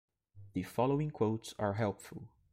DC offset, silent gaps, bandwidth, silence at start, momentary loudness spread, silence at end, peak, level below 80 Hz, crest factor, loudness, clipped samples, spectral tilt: under 0.1%; none; 16 kHz; 0.35 s; 14 LU; 0.25 s; -18 dBFS; -66 dBFS; 18 dB; -35 LUFS; under 0.1%; -7 dB/octave